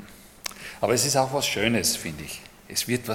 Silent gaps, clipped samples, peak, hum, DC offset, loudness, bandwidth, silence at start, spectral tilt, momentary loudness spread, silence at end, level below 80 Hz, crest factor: none; under 0.1%; -4 dBFS; none; under 0.1%; -24 LUFS; 17.5 kHz; 0 s; -3 dB/octave; 15 LU; 0 s; -54 dBFS; 22 dB